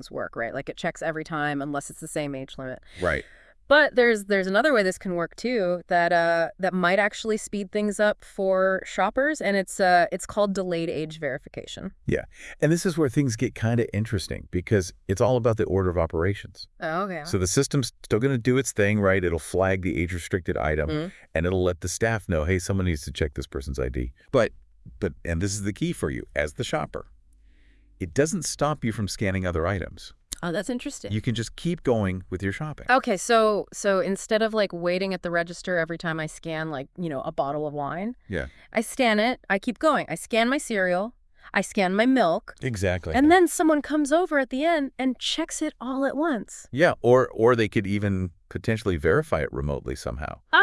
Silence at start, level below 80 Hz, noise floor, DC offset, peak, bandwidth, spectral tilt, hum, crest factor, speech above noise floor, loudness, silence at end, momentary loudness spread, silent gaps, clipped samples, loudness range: 0 s; -46 dBFS; -55 dBFS; under 0.1%; -4 dBFS; 12 kHz; -5 dB/octave; none; 20 dB; 31 dB; -25 LUFS; 0 s; 11 LU; none; under 0.1%; 6 LU